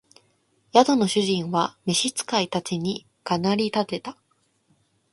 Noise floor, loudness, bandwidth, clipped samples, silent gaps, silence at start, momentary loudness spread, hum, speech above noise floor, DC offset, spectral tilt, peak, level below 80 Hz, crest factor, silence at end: -66 dBFS; -23 LUFS; 11.5 kHz; under 0.1%; none; 0.75 s; 11 LU; none; 43 dB; under 0.1%; -4 dB/octave; -2 dBFS; -66 dBFS; 22 dB; 1 s